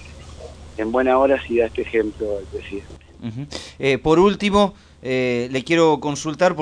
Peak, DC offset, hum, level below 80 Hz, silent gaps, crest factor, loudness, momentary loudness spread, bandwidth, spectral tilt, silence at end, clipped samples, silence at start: -4 dBFS; under 0.1%; none; -42 dBFS; none; 16 dB; -19 LUFS; 18 LU; 10.5 kHz; -5.5 dB/octave; 0 s; under 0.1%; 0 s